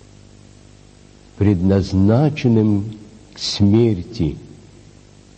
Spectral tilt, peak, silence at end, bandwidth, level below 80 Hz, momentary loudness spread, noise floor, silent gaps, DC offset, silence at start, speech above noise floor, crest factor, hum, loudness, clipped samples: -7.5 dB/octave; -2 dBFS; 0.9 s; 8.6 kHz; -42 dBFS; 11 LU; -46 dBFS; none; under 0.1%; 1.4 s; 30 dB; 16 dB; 50 Hz at -35 dBFS; -17 LUFS; under 0.1%